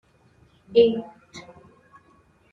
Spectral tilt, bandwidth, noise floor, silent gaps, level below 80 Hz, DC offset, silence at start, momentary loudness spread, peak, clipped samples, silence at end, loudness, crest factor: -6 dB/octave; 7.2 kHz; -59 dBFS; none; -64 dBFS; under 0.1%; 0.7 s; 25 LU; -6 dBFS; under 0.1%; 1.1 s; -21 LUFS; 22 dB